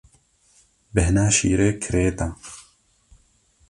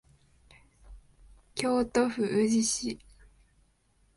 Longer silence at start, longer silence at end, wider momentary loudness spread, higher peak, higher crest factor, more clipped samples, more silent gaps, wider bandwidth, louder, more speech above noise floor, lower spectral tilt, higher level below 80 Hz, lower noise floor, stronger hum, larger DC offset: about the same, 0.95 s vs 0.85 s; about the same, 1.1 s vs 1.2 s; first, 21 LU vs 12 LU; first, -4 dBFS vs -8 dBFS; about the same, 20 dB vs 24 dB; neither; neither; about the same, 11.5 kHz vs 11.5 kHz; first, -21 LUFS vs -28 LUFS; about the same, 40 dB vs 40 dB; first, -5 dB/octave vs -3.5 dB/octave; first, -34 dBFS vs -58 dBFS; second, -60 dBFS vs -68 dBFS; neither; neither